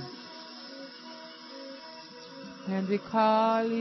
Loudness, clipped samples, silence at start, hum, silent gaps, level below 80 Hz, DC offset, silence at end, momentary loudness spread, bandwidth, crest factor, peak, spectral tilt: -27 LUFS; under 0.1%; 0 s; none; none; -78 dBFS; under 0.1%; 0 s; 20 LU; 6.2 kHz; 18 dB; -14 dBFS; -6.5 dB/octave